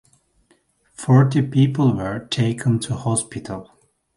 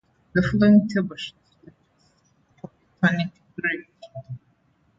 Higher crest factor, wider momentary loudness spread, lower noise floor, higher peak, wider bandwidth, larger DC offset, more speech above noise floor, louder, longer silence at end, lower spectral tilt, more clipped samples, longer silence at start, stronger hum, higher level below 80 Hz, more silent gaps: about the same, 20 dB vs 20 dB; second, 16 LU vs 27 LU; about the same, -61 dBFS vs -64 dBFS; first, 0 dBFS vs -6 dBFS; first, 11.5 kHz vs 7.6 kHz; neither; about the same, 43 dB vs 43 dB; first, -19 LUFS vs -22 LUFS; about the same, 0.55 s vs 0.6 s; second, -6 dB/octave vs -7.5 dB/octave; neither; first, 1 s vs 0.35 s; neither; about the same, -52 dBFS vs -52 dBFS; neither